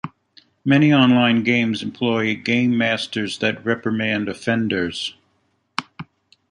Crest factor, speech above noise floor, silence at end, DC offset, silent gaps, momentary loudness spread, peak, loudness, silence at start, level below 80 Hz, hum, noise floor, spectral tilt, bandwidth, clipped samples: 18 dB; 48 dB; 0.5 s; under 0.1%; none; 16 LU; -2 dBFS; -19 LUFS; 0.05 s; -58 dBFS; none; -66 dBFS; -6 dB/octave; 10.5 kHz; under 0.1%